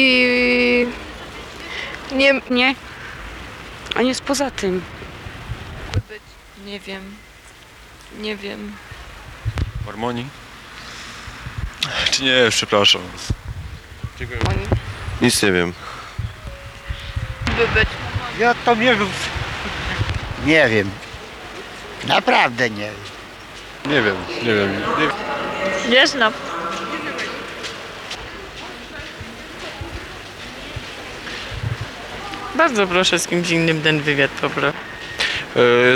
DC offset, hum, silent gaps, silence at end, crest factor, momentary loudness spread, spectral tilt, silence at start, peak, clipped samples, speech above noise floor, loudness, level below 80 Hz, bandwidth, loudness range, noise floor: under 0.1%; none; none; 0 s; 18 dB; 19 LU; -4 dB/octave; 0 s; -4 dBFS; under 0.1%; 25 dB; -19 LUFS; -38 dBFS; 18.5 kHz; 13 LU; -43 dBFS